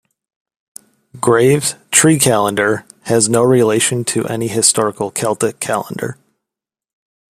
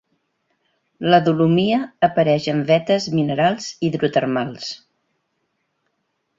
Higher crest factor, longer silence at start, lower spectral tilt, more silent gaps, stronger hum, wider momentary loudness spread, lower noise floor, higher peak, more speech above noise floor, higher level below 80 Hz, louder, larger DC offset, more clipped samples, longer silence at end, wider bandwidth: about the same, 16 dB vs 18 dB; first, 1.15 s vs 1 s; second, -3.5 dB/octave vs -6.5 dB/octave; neither; neither; about the same, 9 LU vs 10 LU; first, -85 dBFS vs -72 dBFS; about the same, 0 dBFS vs -2 dBFS; first, 70 dB vs 54 dB; about the same, -56 dBFS vs -60 dBFS; first, -14 LUFS vs -19 LUFS; neither; neither; second, 1.2 s vs 1.6 s; first, 16 kHz vs 7.8 kHz